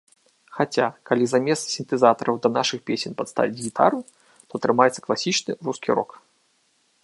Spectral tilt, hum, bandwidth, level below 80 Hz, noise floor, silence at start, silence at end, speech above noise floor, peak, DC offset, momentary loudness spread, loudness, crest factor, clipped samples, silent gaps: -4 dB/octave; none; 11.5 kHz; -72 dBFS; -66 dBFS; 0.5 s; 1 s; 43 dB; -2 dBFS; under 0.1%; 9 LU; -23 LUFS; 22 dB; under 0.1%; none